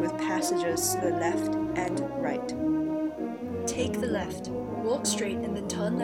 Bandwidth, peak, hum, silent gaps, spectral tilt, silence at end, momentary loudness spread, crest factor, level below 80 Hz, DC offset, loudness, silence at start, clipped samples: 17.5 kHz; -14 dBFS; none; none; -4.5 dB/octave; 0 s; 6 LU; 14 dB; -56 dBFS; under 0.1%; -29 LUFS; 0 s; under 0.1%